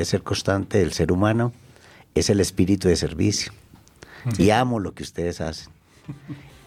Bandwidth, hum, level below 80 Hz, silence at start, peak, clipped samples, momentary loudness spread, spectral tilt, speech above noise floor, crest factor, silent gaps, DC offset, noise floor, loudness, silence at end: 15.5 kHz; none; -44 dBFS; 0 s; -6 dBFS; under 0.1%; 17 LU; -5.5 dB/octave; 28 dB; 18 dB; none; under 0.1%; -50 dBFS; -22 LUFS; 0.15 s